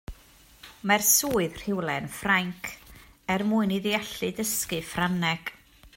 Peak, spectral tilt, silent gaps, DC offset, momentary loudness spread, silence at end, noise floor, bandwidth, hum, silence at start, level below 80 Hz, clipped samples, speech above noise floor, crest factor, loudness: -6 dBFS; -3 dB/octave; none; under 0.1%; 17 LU; 0.1 s; -55 dBFS; 16.5 kHz; none; 0.1 s; -52 dBFS; under 0.1%; 28 dB; 22 dB; -26 LUFS